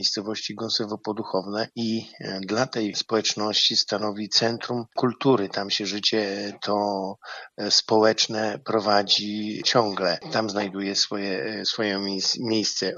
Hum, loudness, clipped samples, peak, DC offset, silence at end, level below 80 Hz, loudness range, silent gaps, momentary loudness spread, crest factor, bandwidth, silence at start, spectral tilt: none; -24 LUFS; under 0.1%; -4 dBFS; under 0.1%; 0 s; -76 dBFS; 3 LU; none; 10 LU; 20 dB; 7.6 kHz; 0 s; -3 dB/octave